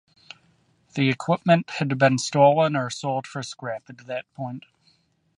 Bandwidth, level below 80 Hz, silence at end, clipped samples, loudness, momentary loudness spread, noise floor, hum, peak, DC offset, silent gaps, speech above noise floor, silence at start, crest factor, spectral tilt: 11.5 kHz; -68 dBFS; 0.8 s; under 0.1%; -23 LUFS; 17 LU; -64 dBFS; none; -4 dBFS; under 0.1%; none; 41 dB; 0.95 s; 20 dB; -5.5 dB/octave